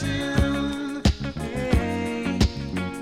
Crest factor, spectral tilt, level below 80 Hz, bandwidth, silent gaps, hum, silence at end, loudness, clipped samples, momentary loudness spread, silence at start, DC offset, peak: 18 dB; -6 dB/octave; -30 dBFS; 15 kHz; none; none; 0 s; -25 LUFS; under 0.1%; 6 LU; 0 s; under 0.1%; -6 dBFS